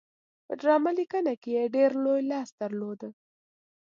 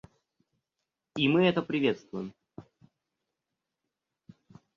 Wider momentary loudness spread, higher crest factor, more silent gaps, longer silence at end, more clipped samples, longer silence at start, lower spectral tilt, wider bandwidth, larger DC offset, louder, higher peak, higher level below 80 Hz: second, 14 LU vs 17 LU; about the same, 18 dB vs 22 dB; first, 1.37-1.41 s, 2.52-2.58 s vs none; second, 0.7 s vs 2.15 s; neither; second, 0.5 s vs 1.15 s; about the same, -6.5 dB/octave vs -7 dB/octave; about the same, 7.4 kHz vs 7.6 kHz; neither; about the same, -28 LUFS vs -28 LUFS; about the same, -10 dBFS vs -10 dBFS; second, -84 dBFS vs -70 dBFS